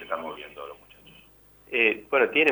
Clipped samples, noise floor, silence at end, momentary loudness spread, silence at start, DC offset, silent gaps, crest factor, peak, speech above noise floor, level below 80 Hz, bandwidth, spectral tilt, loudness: under 0.1%; -55 dBFS; 0 s; 20 LU; 0 s; under 0.1%; none; 20 dB; -8 dBFS; 30 dB; -66 dBFS; over 20 kHz; -4.5 dB/octave; -24 LUFS